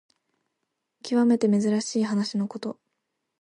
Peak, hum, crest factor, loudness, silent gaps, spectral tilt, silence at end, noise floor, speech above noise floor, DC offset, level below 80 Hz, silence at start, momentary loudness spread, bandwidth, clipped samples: -12 dBFS; none; 16 dB; -24 LUFS; none; -5.5 dB/octave; 0.7 s; -80 dBFS; 57 dB; under 0.1%; -76 dBFS; 1.05 s; 15 LU; 10.5 kHz; under 0.1%